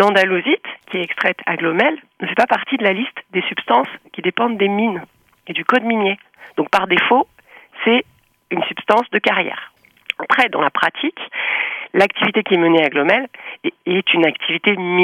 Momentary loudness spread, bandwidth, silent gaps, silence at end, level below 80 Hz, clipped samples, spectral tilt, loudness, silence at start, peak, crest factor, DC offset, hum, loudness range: 11 LU; 13.5 kHz; none; 0 s; -66 dBFS; under 0.1%; -5.5 dB/octave; -17 LUFS; 0 s; 0 dBFS; 16 dB; under 0.1%; none; 3 LU